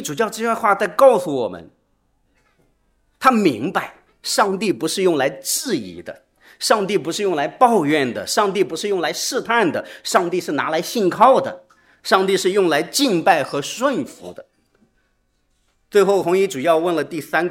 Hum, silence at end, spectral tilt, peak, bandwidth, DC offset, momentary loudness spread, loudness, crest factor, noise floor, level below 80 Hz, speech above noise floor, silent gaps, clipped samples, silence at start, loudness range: none; 0 s; -3.5 dB/octave; 0 dBFS; 16.5 kHz; under 0.1%; 12 LU; -18 LUFS; 20 dB; -65 dBFS; -64 dBFS; 47 dB; none; under 0.1%; 0 s; 4 LU